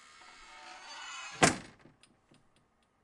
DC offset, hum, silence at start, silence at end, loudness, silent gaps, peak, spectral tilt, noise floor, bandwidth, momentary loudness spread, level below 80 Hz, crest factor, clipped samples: under 0.1%; none; 0.2 s; 1.35 s; -32 LUFS; none; -6 dBFS; -3 dB/octave; -71 dBFS; 11.5 kHz; 25 LU; -62 dBFS; 32 dB; under 0.1%